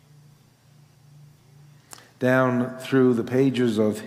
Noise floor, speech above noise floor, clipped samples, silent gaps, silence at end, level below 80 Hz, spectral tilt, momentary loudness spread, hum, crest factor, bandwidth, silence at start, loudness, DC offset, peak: -55 dBFS; 34 dB; under 0.1%; none; 0 s; -74 dBFS; -7 dB/octave; 5 LU; none; 18 dB; 15.5 kHz; 2.2 s; -22 LUFS; under 0.1%; -8 dBFS